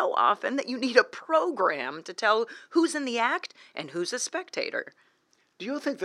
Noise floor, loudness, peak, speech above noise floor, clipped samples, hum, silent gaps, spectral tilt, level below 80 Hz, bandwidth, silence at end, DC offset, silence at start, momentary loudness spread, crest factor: -69 dBFS; -27 LUFS; -4 dBFS; 41 dB; under 0.1%; none; none; -2.5 dB/octave; under -90 dBFS; 12.5 kHz; 0 s; under 0.1%; 0 s; 12 LU; 24 dB